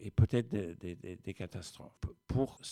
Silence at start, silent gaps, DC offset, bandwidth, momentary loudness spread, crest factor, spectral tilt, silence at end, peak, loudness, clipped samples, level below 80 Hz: 0 s; none; under 0.1%; 12.5 kHz; 15 LU; 20 dB; -7 dB/octave; 0 s; -16 dBFS; -37 LUFS; under 0.1%; -50 dBFS